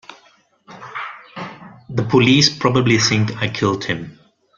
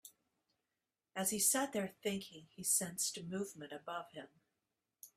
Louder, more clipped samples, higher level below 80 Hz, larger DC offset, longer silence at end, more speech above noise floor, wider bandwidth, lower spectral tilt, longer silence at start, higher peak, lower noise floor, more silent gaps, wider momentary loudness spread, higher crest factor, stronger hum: first, -16 LUFS vs -37 LUFS; neither; first, -52 dBFS vs -80 dBFS; neither; first, 0.45 s vs 0.1 s; second, 38 dB vs over 50 dB; second, 7.6 kHz vs 15.5 kHz; first, -4.5 dB/octave vs -2.5 dB/octave; about the same, 0.1 s vs 0.05 s; first, -2 dBFS vs -20 dBFS; second, -54 dBFS vs under -90 dBFS; neither; first, 20 LU vs 17 LU; about the same, 18 dB vs 22 dB; neither